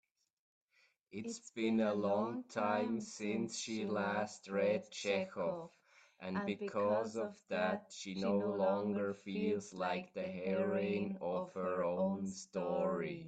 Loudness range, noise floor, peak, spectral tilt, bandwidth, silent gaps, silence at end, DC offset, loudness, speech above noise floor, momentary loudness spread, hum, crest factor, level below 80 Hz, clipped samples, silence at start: 2 LU; -75 dBFS; -20 dBFS; -5.5 dB/octave; 9.2 kHz; none; 0 s; under 0.1%; -38 LUFS; 38 dB; 8 LU; none; 18 dB; -80 dBFS; under 0.1%; 1.1 s